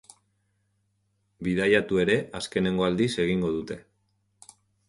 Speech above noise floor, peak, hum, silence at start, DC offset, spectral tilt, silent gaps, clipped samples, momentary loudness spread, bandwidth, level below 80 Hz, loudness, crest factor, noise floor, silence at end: 48 dB; -8 dBFS; none; 1.4 s; under 0.1%; -5.5 dB/octave; none; under 0.1%; 11 LU; 11.5 kHz; -54 dBFS; -25 LUFS; 20 dB; -73 dBFS; 1.1 s